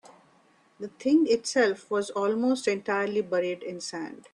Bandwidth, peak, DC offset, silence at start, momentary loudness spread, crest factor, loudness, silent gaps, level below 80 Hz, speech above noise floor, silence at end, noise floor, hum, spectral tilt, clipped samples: 11.5 kHz; -10 dBFS; under 0.1%; 0.8 s; 12 LU; 16 dB; -27 LUFS; none; -74 dBFS; 35 dB; 0.15 s; -62 dBFS; none; -4 dB/octave; under 0.1%